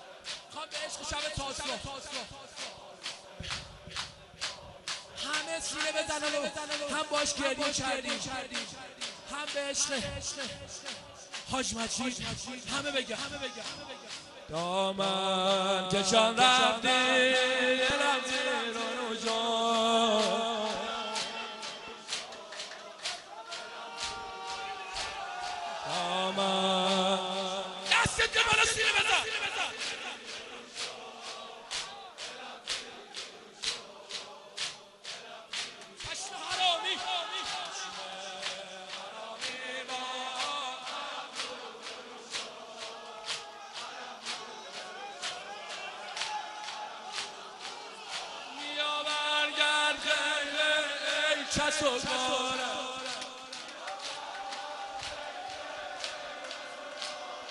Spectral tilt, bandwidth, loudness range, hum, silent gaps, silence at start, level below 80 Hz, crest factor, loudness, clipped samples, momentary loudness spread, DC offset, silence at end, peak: -1.5 dB/octave; 12 kHz; 12 LU; none; none; 0 s; -60 dBFS; 24 dB; -32 LUFS; under 0.1%; 16 LU; under 0.1%; 0 s; -10 dBFS